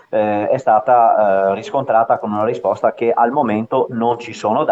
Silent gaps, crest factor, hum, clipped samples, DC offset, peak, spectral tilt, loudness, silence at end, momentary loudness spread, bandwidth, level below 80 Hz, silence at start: none; 14 dB; none; under 0.1%; under 0.1%; -2 dBFS; -7 dB/octave; -16 LUFS; 0 s; 7 LU; 8 kHz; -66 dBFS; 0.1 s